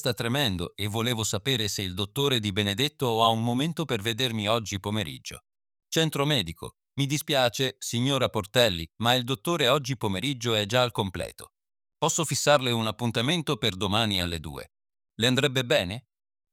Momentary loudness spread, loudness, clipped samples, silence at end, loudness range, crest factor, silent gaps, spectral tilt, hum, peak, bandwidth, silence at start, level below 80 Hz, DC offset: 8 LU; -26 LUFS; under 0.1%; 0.5 s; 3 LU; 20 dB; none; -4 dB/octave; none; -6 dBFS; 18 kHz; 0 s; -58 dBFS; under 0.1%